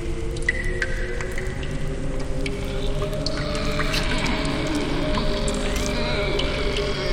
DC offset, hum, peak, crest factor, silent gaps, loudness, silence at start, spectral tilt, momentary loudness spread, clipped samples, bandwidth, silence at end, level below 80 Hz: under 0.1%; none; -6 dBFS; 18 dB; none; -25 LUFS; 0 s; -4.5 dB/octave; 6 LU; under 0.1%; 15.5 kHz; 0 s; -28 dBFS